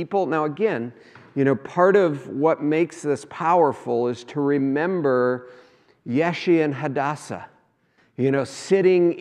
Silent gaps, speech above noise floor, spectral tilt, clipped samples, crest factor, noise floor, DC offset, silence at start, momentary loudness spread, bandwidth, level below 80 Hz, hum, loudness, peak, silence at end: none; 41 dB; -7 dB/octave; under 0.1%; 18 dB; -62 dBFS; under 0.1%; 0 s; 12 LU; 10.5 kHz; -74 dBFS; none; -22 LUFS; -4 dBFS; 0 s